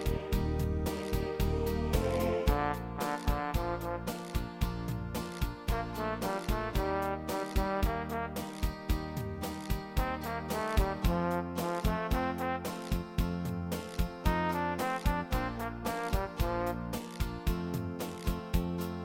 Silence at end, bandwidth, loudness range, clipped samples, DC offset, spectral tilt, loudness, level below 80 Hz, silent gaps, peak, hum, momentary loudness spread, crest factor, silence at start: 0 s; 17 kHz; 3 LU; under 0.1%; under 0.1%; -6 dB/octave; -34 LUFS; -38 dBFS; none; -14 dBFS; none; 6 LU; 20 dB; 0 s